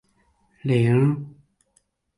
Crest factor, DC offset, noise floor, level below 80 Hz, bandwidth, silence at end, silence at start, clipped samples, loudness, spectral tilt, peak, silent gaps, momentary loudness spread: 16 dB; under 0.1%; -67 dBFS; -60 dBFS; 11.5 kHz; 0.9 s; 0.65 s; under 0.1%; -22 LUFS; -9 dB/octave; -8 dBFS; none; 15 LU